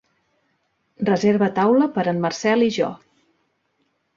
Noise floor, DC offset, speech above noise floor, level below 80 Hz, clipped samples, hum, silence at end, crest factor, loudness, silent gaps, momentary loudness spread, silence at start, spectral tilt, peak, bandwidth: -69 dBFS; under 0.1%; 50 dB; -64 dBFS; under 0.1%; none; 1.2 s; 16 dB; -20 LUFS; none; 7 LU; 1 s; -6 dB/octave; -6 dBFS; 7.6 kHz